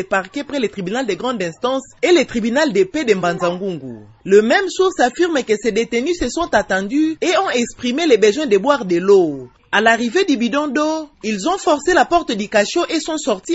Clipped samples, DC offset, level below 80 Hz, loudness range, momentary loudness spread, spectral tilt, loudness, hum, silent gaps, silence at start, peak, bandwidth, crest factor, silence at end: under 0.1%; under 0.1%; -48 dBFS; 3 LU; 8 LU; -4 dB/octave; -17 LUFS; none; none; 0 s; 0 dBFS; 8 kHz; 16 dB; 0 s